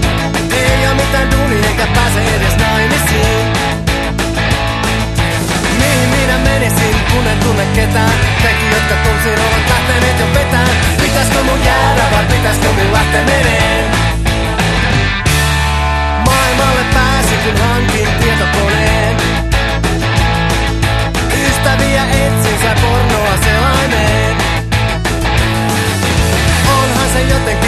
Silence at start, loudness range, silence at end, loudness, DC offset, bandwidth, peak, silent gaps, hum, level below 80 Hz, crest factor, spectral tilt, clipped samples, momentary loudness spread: 0 s; 2 LU; 0 s; -12 LUFS; under 0.1%; 13 kHz; 0 dBFS; none; none; -18 dBFS; 12 dB; -4.5 dB/octave; under 0.1%; 3 LU